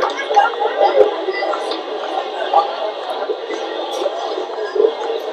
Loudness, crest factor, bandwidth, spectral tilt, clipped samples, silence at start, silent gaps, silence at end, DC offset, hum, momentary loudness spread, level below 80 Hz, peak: -19 LUFS; 18 dB; 12.5 kHz; -1.5 dB/octave; under 0.1%; 0 s; none; 0 s; under 0.1%; none; 8 LU; -68 dBFS; 0 dBFS